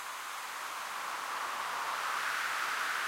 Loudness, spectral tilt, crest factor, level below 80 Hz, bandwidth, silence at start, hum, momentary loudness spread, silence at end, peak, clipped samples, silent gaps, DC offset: -35 LUFS; 1 dB/octave; 16 dB; -84 dBFS; 16 kHz; 0 s; none; 6 LU; 0 s; -22 dBFS; under 0.1%; none; under 0.1%